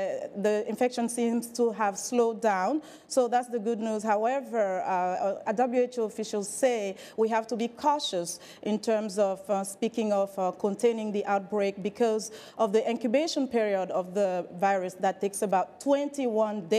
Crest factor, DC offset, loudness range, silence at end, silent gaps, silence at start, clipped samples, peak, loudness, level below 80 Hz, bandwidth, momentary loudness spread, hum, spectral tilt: 14 dB; under 0.1%; 1 LU; 0 s; none; 0 s; under 0.1%; -14 dBFS; -28 LUFS; -78 dBFS; 15 kHz; 5 LU; none; -4.5 dB/octave